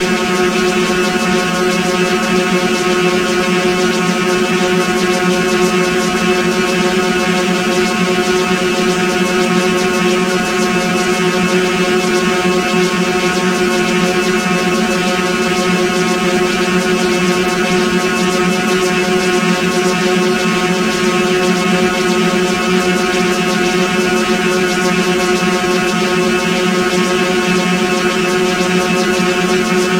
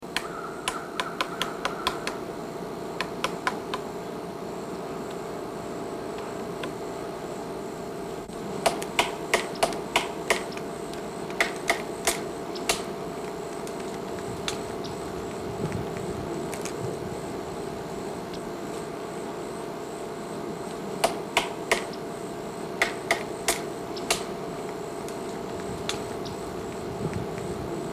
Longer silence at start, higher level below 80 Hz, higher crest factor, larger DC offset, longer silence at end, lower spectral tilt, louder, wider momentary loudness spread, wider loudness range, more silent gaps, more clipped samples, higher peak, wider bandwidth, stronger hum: about the same, 0 s vs 0 s; first, -42 dBFS vs -54 dBFS; second, 14 dB vs 20 dB; neither; about the same, 0 s vs 0 s; about the same, -4 dB/octave vs -3.5 dB/octave; first, -13 LUFS vs -31 LUFS; second, 1 LU vs 8 LU; second, 0 LU vs 6 LU; neither; neither; first, 0 dBFS vs -12 dBFS; about the same, 16 kHz vs 16 kHz; neither